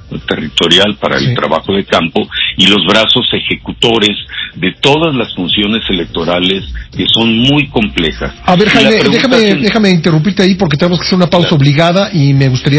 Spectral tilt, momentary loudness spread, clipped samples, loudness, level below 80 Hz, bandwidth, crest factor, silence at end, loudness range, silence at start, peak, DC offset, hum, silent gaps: -5.5 dB/octave; 8 LU; 1%; -10 LUFS; -32 dBFS; 8 kHz; 10 dB; 0 s; 3 LU; 0.05 s; 0 dBFS; under 0.1%; none; none